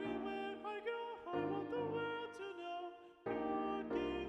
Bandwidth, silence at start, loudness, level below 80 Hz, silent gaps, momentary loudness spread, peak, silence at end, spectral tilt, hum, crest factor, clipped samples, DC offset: 10.5 kHz; 0 s; -43 LUFS; -68 dBFS; none; 7 LU; -28 dBFS; 0 s; -6.5 dB/octave; none; 16 dB; under 0.1%; under 0.1%